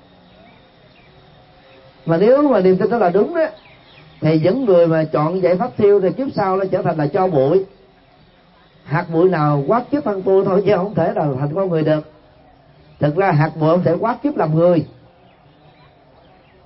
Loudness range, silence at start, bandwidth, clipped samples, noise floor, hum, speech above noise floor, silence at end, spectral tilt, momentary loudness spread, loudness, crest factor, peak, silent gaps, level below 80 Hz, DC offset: 3 LU; 2.05 s; 5.8 kHz; under 0.1%; -50 dBFS; none; 35 dB; 1.75 s; -12.5 dB/octave; 7 LU; -16 LUFS; 16 dB; -2 dBFS; none; -54 dBFS; under 0.1%